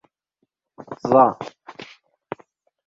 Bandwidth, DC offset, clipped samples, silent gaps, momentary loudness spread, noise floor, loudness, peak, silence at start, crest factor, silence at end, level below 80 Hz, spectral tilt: 7.4 kHz; under 0.1%; under 0.1%; none; 24 LU; -74 dBFS; -18 LUFS; -2 dBFS; 0.8 s; 22 dB; 1.05 s; -64 dBFS; -7.5 dB/octave